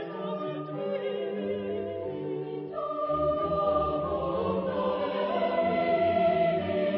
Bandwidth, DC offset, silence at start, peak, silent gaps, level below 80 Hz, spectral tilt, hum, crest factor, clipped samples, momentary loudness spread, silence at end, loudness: 5.6 kHz; under 0.1%; 0 s; -14 dBFS; none; -52 dBFS; -5 dB/octave; none; 14 dB; under 0.1%; 9 LU; 0 s; -29 LUFS